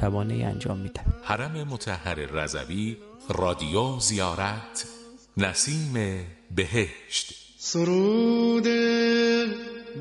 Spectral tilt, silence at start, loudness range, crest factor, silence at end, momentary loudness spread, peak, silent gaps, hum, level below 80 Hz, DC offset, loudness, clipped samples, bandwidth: -4.5 dB/octave; 0 s; 6 LU; 20 dB; 0 s; 12 LU; -6 dBFS; none; none; -42 dBFS; under 0.1%; -26 LUFS; under 0.1%; 11.5 kHz